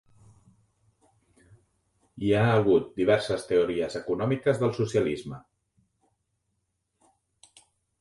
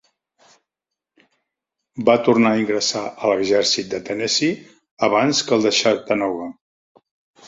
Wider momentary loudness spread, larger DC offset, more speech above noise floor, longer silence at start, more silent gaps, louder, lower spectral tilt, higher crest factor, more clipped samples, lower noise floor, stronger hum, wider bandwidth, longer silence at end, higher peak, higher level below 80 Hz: about the same, 9 LU vs 9 LU; neither; second, 53 dB vs 66 dB; first, 2.15 s vs 1.95 s; second, none vs 4.91-4.97 s; second, -26 LUFS vs -19 LUFS; first, -7 dB/octave vs -3.5 dB/octave; about the same, 18 dB vs 20 dB; neither; second, -78 dBFS vs -85 dBFS; neither; first, 11.5 kHz vs 7.8 kHz; first, 2.6 s vs 0.95 s; second, -10 dBFS vs -2 dBFS; about the same, -58 dBFS vs -62 dBFS